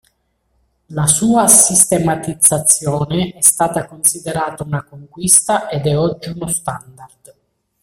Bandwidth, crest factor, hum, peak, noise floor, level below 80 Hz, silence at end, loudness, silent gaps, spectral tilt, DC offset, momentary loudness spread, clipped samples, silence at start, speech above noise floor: over 20 kHz; 16 dB; none; 0 dBFS; -64 dBFS; -48 dBFS; 0.75 s; -13 LUFS; none; -3.5 dB/octave; under 0.1%; 16 LU; 0.1%; 0.9 s; 49 dB